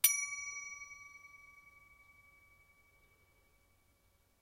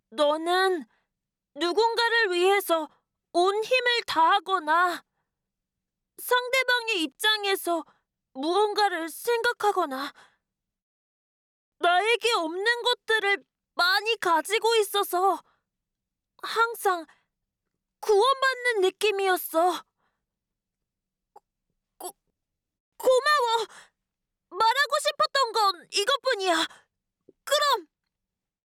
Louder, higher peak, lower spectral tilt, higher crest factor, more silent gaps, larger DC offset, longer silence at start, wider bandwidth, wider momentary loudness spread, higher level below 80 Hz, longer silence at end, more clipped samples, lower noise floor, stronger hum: second, -38 LUFS vs -24 LUFS; about the same, -12 dBFS vs -14 dBFS; second, 3.5 dB/octave vs -0.5 dB/octave; first, 32 dB vs 14 dB; second, none vs 10.82-11.72 s, 22.80-22.92 s; neither; about the same, 0.05 s vs 0.1 s; second, 16 kHz vs 19 kHz; first, 25 LU vs 10 LU; about the same, -76 dBFS vs -76 dBFS; first, 2.7 s vs 0.8 s; neither; second, -73 dBFS vs -87 dBFS; neither